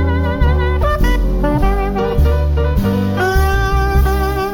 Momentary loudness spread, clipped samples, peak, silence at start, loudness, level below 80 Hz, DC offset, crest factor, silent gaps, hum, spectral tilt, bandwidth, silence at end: 2 LU; under 0.1%; -4 dBFS; 0 s; -16 LUFS; -16 dBFS; under 0.1%; 10 dB; none; none; -7 dB/octave; 17 kHz; 0 s